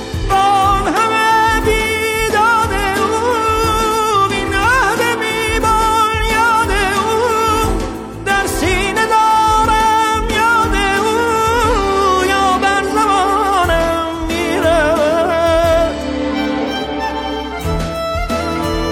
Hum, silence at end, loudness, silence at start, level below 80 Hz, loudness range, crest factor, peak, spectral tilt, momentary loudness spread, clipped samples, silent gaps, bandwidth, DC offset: none; 0 s; -14 LUFS; 0 s; -26 dBFS; 2 LU; 10 dB; -4 dBFS; -4 dB/octave; 7 LU; under 0.1%; none; 17 kHz; under 0.1%